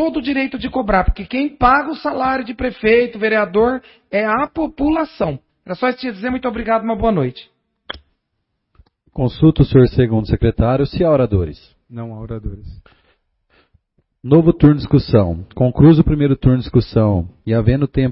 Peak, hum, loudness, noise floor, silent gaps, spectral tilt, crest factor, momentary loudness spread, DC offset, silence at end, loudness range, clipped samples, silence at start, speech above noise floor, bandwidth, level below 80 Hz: 0 dBFS; none; -16 LUFS; -72 dBFS; none; -12.5 dB/octave; 16 dB; 16 LU; under 0.1%; 0 s; 7 LU; under 0.1%; 0 s; 57 dB; 5.8 kHz; -32 dBFS